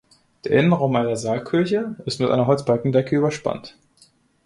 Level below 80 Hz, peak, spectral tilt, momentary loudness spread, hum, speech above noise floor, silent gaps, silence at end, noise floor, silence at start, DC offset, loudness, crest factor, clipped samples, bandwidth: -58 dBFS; -4 dBFS; -6.5 dB/octave; 10 LU; none; 37 dB; none; 0.75 s; -57 dBFS; 0.45 s; under 0.1%; -21 LUFS; 16 dB; under 0.1%; 11.5 kHz